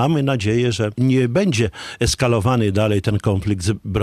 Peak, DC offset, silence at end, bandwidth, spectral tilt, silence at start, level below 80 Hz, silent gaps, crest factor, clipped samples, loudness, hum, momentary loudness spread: -4 dBFS; under 0.1%; 0 s; 14 kHz; -6 dB/octave; 0 s; -38 dBFS; none; 14 dB; under 0.1%; -19 LUFS; none; 5 LU